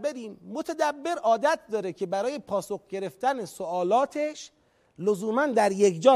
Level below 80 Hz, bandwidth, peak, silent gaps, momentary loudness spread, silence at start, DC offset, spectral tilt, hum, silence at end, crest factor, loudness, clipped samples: -72 dBFS; 15 kHz; -6 dBFS; none; 12 LU; 0 s; under 0.1%; -4.5 dB/octave; none; 0 s; 20 dB; -27 LUFS; under 0.1%